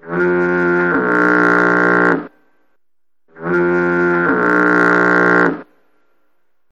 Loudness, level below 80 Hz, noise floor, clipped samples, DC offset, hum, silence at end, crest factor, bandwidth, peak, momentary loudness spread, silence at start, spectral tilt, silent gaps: -13 LUFS; -52 dBFS; -82 dBFS; under 0.1%; 0.2%; none; 1.1 s; 16 dB; 7.6 kHz; 0 dBFS; 6 LU; 0.05 s; -7.5 dB/octave; none